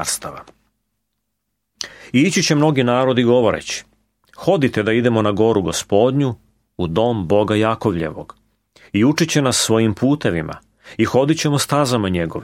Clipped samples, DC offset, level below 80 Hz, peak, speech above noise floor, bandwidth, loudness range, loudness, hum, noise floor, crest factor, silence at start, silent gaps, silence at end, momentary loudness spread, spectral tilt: under 0.1%; under 0.1%; -48 dBFS; -2 dBFS; 58 dB; 16.5 kHz; 2 LU; -17 LUFS; none; -75 dBFS; 16 dB; 0 s; none; 0 s; 12 LU; -5 dB/octave